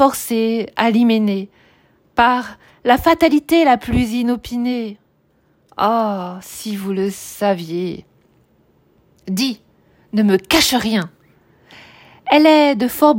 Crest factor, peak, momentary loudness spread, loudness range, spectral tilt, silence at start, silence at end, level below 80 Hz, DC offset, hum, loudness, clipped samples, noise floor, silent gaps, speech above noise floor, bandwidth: 16 dB; 0 dBFS; 16 LU; 8 LU; -4.5 dB/octave; 0 s; 0 s; -44 dBFS; under 0.1%; none; -16 LUFS; under 0.1%; -59 dBFS; none; 43 dB; 16.5 kHz